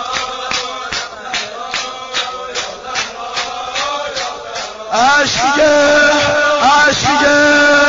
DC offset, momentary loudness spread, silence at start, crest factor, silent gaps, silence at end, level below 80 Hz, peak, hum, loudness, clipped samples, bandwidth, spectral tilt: under 0.1%; 12 LU; 0 s; 12 dB; none; 0 s; -44 dBFS; -2 dBFS; none; -13 LUFS; under 0.1%; 7.6 kHz; -0.5 dB/octave